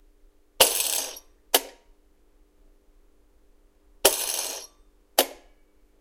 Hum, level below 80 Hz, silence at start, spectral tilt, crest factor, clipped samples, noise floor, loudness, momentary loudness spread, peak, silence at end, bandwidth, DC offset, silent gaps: none; -58 dBFS; 0.6 s; 1 dB/octave; 30 dB; under 0.1%; -59 dBFS; -23 LUFS; 19 LU; 0 dBFS; 0.65 s; 17 kHz; under 0.1%; none